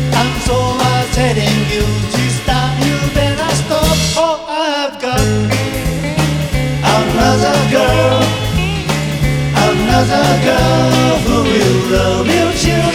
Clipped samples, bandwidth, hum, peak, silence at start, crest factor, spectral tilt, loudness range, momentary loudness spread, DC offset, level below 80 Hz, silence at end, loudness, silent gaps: under 0.1%; 16.5 kHz; none; 0 dBFS; 0 s; 12 dB; -5 dB/octave; 3 LU; 5 LU; 0.2%; -26 dBFS; 0 s; -13 LUFS; none